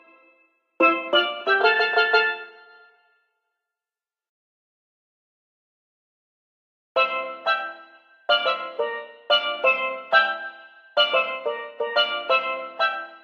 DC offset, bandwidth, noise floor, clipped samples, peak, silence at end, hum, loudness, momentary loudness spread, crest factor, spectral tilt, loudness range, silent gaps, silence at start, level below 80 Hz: under 0.1%; 11.5 kHz; under -90 dBFS; under 0.1%; -4 dBFS; 0.05 s; none; -22 LUFS; 11 LU; 22 dB; -2.5 dB/octave; 7 LU; 4.29-6.95 s; 0.8 s; -88 dBFS